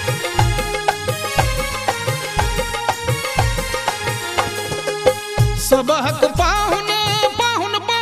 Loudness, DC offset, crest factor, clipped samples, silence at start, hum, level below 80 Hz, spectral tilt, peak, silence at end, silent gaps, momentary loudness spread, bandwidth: -18 LUFS; under 0.1%; 18 dB; under 0.1%; 0 s; none; -30 dBFS; -3.5 dB/octave; 0 dBFS; 0 s; none; 5 LU; 15.5 kHz